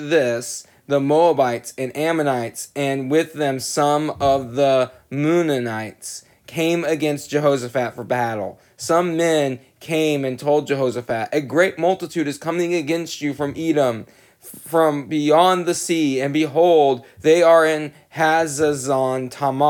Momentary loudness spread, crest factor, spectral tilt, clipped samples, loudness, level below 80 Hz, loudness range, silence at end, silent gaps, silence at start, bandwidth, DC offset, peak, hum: 11 LU; 18 dB; -5 dB/octave; under 0.1%; -19 LUFS; -58 dBFS; 5 LU; 0 s; none; 0 s; 18.5 kHz; under 0.1%; -2 dBFS; none